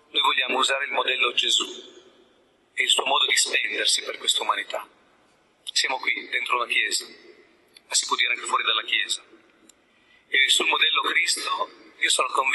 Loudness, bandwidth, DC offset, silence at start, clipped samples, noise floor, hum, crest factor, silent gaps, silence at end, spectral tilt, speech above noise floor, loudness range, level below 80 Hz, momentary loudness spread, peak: -22 LUFS; 12 kHz; under 0.1%; 0.15 s; under 0.1%; -61 dBFS; none; 20 dB; none; 0 s; 2.5 dB/octave; 37 dB; 4 LU; -82 dBFS; 10 LU; -6 dBFS